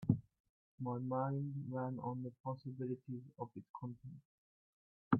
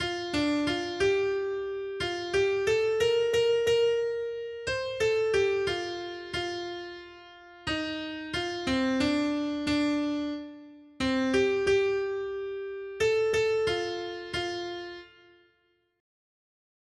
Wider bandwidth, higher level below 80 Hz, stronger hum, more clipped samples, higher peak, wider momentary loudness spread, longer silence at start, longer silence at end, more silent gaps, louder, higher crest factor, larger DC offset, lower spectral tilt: second, 4.5 kHz vs 12.5 kHz; second, -74 dBFS vs -56 dBFS; neither; neither; second, -18 dBFS vs -14 dBFS; about the same, 11 LU vs 12 LU; about the same, 0 s vs 0 s; second, 0 s vs 1.95 s; first, 0.40-0.78 s, 2.40-2.44 s, 3.70-3.74 s, 4.25-5.11 s vs none; second, -44 LUFS vs -29 LUFS; first, 26 dB vs 14 dB; neither; first, -10 dB/octave vs -4.5 dB/octave